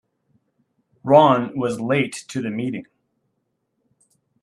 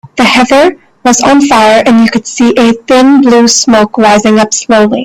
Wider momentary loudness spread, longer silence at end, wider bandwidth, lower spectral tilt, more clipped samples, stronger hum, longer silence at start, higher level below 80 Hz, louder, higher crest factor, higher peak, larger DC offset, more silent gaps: first, 15 LU vs 5 LU; first, 1.6 s vs 0 s; second, 12.5 kHz vs 14.5 kHz; first, -6 dB/octave vs -3.5 dB/octave; second, under 0.1% vs 0.4%; neither; first, 1.05 s vs 0.15 s; second, -66 dBFS vs -42 dBFS; second, -19 LUFS vs -6 LUFS; first, 22 dB vs 6 dB; about the same, 0 dBFS vs 0 dBFS; neither; neither